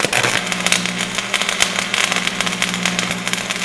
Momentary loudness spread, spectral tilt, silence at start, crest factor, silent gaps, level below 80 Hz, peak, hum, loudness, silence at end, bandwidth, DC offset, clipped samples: 4 LU; -1.5 dB/octave; 0 s; 20 dB; none; -50 dBFS; 0 dBFS; 60 Hz at -35 dBFS; -17 LUFS; 0 s; 11 kHz; under 0.1%; 0.1%